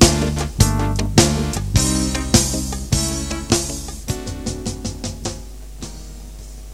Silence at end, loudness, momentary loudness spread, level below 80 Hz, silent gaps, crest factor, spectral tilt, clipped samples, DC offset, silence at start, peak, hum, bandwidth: 0 s; -20 LUFS; 19 LU; -28 dBFS; none; 20 dB; -4 dB/octave; under 0.1%; 0.4%; 0 s; 0 dBFS; none; 16.5 kHz